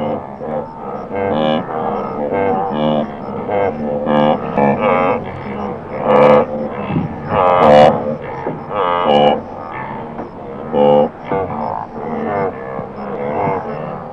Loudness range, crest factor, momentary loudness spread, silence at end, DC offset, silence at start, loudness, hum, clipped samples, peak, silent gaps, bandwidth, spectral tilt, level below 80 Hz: 6 LU; 16 dB; 15 LU; 0 s; under 0.1%; 0 s; -16 LUFS; none; under 0.1%; 0 dBFS; none; 7.4 kHz; -8 dB/octave; -44 dBFS